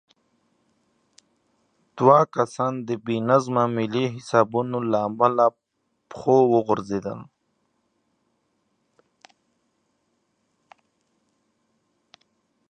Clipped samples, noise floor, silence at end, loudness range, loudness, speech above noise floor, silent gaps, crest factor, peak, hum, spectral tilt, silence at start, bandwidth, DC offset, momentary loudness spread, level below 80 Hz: under 0.1%; -74 dBFS; 5.45 s; 4 LU; -22 LUFS; 53 dB; none; 24 dB; -2 dBFS; none; -7 dB/octave; 1.95 s; 10 kHz; under 0.1%; 12 LU; -68 dBFS